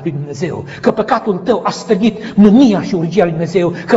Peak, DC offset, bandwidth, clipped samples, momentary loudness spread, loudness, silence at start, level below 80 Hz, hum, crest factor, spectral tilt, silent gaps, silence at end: 0 dBFS; under 0.1%; 8 kHz; 0.5%; 13 LU; -13 LUFS; 0 s; -46 dBFS; none; 12 dB; -7 dB/octave; none; 0 s